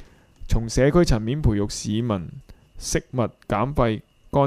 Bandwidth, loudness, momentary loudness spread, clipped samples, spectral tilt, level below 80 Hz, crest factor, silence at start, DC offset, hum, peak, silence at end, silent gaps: 15.5 kHz; -23 LUFS; 10 LU; under 0.1%; -6 dB/octave; -32 dBFS; 18 dB; 0 s; under 0.1%; none; -4 dBFS; 0 s; none